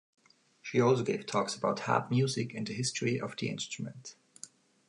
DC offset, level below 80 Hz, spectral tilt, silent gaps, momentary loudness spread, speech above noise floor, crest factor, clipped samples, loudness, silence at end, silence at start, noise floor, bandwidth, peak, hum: under 0.1%; -74 dBFS; -5 dB/octave; none; 21 LU; 23 dB; 22 dB; under 0.1%; -32 LUFS; 0.45 s; 0.65 s; -54 dBFS; 11.5 kHz; -12 dBFS; none